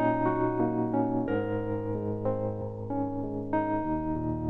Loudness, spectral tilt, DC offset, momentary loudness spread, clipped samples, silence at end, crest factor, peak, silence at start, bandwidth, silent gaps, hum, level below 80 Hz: -30 LUFS; -11 dB/octave; under 0.1%; 5 LU; under 0.1%; 0 s; 14 dB; -16 dBFS; 0 s; 4 kHz; none; none; -48 dBFS